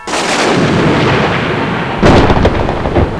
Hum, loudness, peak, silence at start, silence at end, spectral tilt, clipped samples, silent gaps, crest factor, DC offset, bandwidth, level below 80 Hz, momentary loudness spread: none; -11 LUFS; 0 dBFS; 0 s; 0 s; -5.5 dB/octave; 0.6%; none; 10 dB; 0.4%; 11 kHz; -22 dBFS; 6 LU